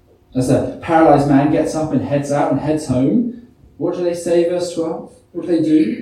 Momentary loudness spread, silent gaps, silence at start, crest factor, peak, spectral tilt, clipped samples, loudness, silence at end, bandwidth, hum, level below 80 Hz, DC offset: 12 LU; none; 0.35 s; 16 dB; 0 dBFS; -7 dB/octave; under 0.1%; -17 LUFS; 0 s; 13 kHz; none; -46 dBFS; under 0.1%